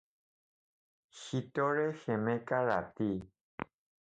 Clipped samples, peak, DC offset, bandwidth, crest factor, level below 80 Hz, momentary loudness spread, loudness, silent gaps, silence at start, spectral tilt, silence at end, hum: under 0.1%; -16 dBFS; under 0.1%; 9 kHz; 20 dB; -68 dBFS; 15 LU; -34 LUFS; 3.41-3.58 s; 1.15 s; -7 dB/octave; 0.5 s; none